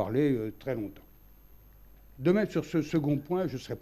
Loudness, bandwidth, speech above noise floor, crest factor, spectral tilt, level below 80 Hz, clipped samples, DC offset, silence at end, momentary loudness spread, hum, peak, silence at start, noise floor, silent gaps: -30 LUFS; 14 kHz; 25 dB; 18 dB; -8 dB/octave; -58 dBFS; under 0.1%; under 0.1%; 0 s; 8 LU; none; -14 dBFS; 0 s; -55 dBFS; none